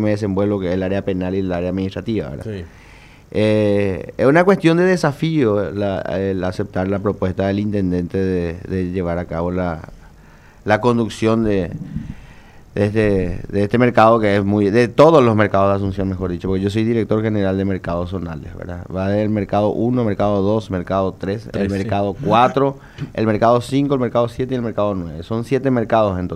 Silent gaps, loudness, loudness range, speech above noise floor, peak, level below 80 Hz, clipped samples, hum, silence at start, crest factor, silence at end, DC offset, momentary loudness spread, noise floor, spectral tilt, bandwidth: none; -18 LUFS; 6 LU; 27 dB; 0 dBFS; -42 dBFS; under 0.1%; none; 0 s; 18 dB; 0 s; under 0.1%; 12 LU; -44 dBFS; -7.5 dB/octave; 12.5 kHz